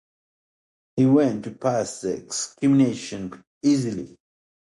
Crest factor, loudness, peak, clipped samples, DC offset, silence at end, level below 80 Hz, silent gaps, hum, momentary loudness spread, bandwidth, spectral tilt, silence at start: 18 dB; -23 LUFS; -6 dBFS; under 0.1%; under 0.1%; 0.65 s; -62 dBFS; 3.47-3.61 s; none; 15 LU; 11.5 kHz; -6 dB/octave; 0.95 s